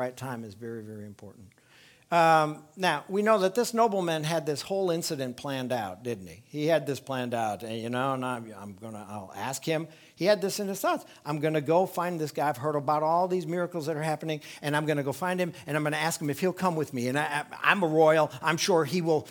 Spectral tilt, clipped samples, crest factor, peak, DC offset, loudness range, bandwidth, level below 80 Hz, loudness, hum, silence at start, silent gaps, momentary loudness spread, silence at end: -5 dB/octave; under 0.1%; 22 dB; -6 dBFS; under 0.1%; 5 LU; 19.5 kHz; -74 dBFS; -28 LUFS; none; 0 s; none; 14 LU; 0 s